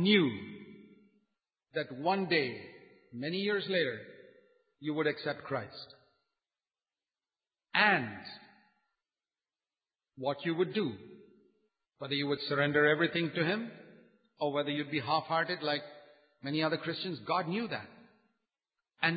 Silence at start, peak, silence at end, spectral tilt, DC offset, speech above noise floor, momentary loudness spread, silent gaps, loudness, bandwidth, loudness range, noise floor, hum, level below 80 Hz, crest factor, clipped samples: 0 s; -10 dBFS; 0 s; -9 dB/octave; under 0.1%; over 58 dB; 20 LU; none; -32 LUFS; 5 kHz; 7 LU; under -90 dBFS; none; -76 dBFS; 24 dB; under 0.1%